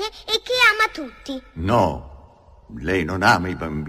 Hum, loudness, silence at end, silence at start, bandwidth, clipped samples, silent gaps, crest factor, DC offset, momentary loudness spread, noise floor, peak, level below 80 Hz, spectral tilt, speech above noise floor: none; -19 LUFS; 0 s; 0 s; 15.5 kHz; under 0.1%; none; 20 dB; under 0.1%; 18 LU; -48 dBFS; -2 dBFS; -42 dBFS; -4.5 dB/octave; 26 dB